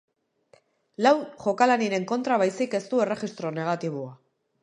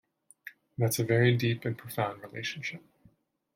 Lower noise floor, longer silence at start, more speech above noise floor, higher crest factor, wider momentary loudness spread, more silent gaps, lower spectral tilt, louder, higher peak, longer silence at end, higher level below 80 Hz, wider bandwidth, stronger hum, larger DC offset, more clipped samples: about the same, -62 dBFS vs -65 dBFS; first, 1 s vs 0.45 s; about the same, 37 dB vs 35 dB; about the same, 20 dB vs 20 dB; second, 11 LU vs 24 LU; neither; about the same, -5.5 dB/octave vs -5.5 dB/octave; first, -25 LUFS vs -30 LUFS; first, -6 dBFS vs -12 dBFS; second, 0.45 s vs 0.75 s; second, -76 dBFS vs -68 dBFS; second, 10.5 kHz vs 16.5 kHz; neither; neither; neither